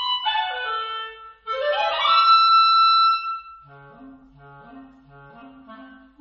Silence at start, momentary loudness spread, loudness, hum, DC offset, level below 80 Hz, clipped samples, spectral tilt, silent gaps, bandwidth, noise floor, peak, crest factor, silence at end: 0 s; 18 LU; -18 LUFS; none; under 0.1%; -62 dBFS; under 0.1%; -2 dB/octave; none; 7 kHz; -47 dBFS; -6 dBFS; 16 dB; 0.35 s